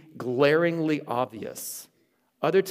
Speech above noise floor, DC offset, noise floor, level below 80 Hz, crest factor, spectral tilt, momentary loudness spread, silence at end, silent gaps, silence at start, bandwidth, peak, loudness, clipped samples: 42 dB; under 0.1%; -67 dBFS; -76 dBFS; 18 dB; -5 dB/octave; 14 LU; 0 s; none; 0.15 s; 16 kHz; -8 dBFS; -26 LUFS; under 0.1%